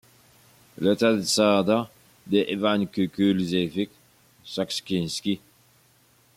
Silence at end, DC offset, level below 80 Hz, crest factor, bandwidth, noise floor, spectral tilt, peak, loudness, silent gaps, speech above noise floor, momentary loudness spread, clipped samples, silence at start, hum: 1 s; under 0.1%; -66 dBFS; 18 dB; 16 kHz; -60 dBFS; -5 dB/octave; -8 dBFS; -24 LUFS; none; 37 dB; 11 LU; under 0.1%; 0.8 s; none